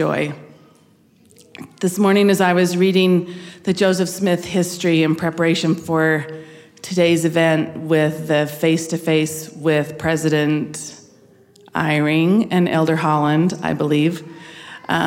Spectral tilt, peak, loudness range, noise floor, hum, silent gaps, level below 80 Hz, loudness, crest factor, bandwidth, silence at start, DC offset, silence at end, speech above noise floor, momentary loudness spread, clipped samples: -5.5 dB/octave; -4 dBFS; 3 LU; -53 dBFS; none; none; -58 dBFS; -18 LUFS; 14 dB; 16.5 kHz; 0 s; under 0.1%; 0 s; 36 dB; 15 LU; under 0.1%